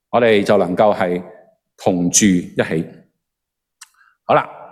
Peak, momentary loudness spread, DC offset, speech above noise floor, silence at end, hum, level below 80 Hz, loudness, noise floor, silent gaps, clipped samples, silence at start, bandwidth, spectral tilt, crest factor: 0 dBFS; 11 LU; under 0.1%; 64 dB; 0.05 s; none; -54 dBFS; -16 LUFS; -79 dBFS; none; under 0.1%; 0.15 s; 15 kHz; -4 dB/octave; 18 dB